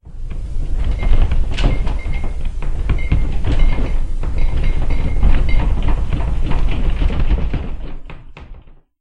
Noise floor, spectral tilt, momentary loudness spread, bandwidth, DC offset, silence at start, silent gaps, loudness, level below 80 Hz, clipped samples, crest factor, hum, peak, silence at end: -37 dBFS; -7 dB/octave; 13 LU; 5 kHz; under 0.1%; 0.05 s; none; -21 LUFS; -16 dBFS; under 0.1%; 14 dB; none; 0 dBFS; 0.3 s